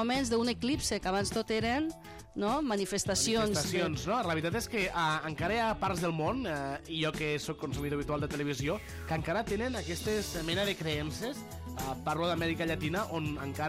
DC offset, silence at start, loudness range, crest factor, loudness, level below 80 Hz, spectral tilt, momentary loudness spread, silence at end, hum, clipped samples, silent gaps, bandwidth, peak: under 0.1%; 0 s; 3 LU; 14 dB; -33 LUFS; -50 dBFS; -4 dB/octave; 7 LU; 0 s; none; under 0.1%; none; 16 kHz; -18 dBFS